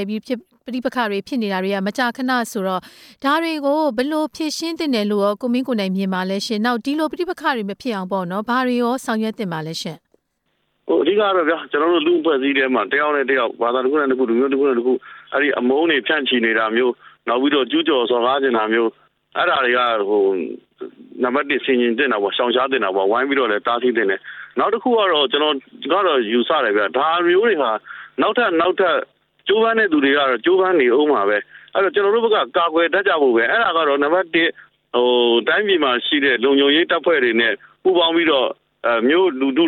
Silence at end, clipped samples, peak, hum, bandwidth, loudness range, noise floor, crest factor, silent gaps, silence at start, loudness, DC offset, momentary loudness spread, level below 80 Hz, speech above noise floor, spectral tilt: 0 s; under 0.1%; -4 dBFS; none; 15 kHz; 5 LU; -70 dBFS; 14 dB; none; 0 s; -18 LUFS; under 0.1%; 9 LU; -66 dBFS; 52 dB; -4.5 dB/octave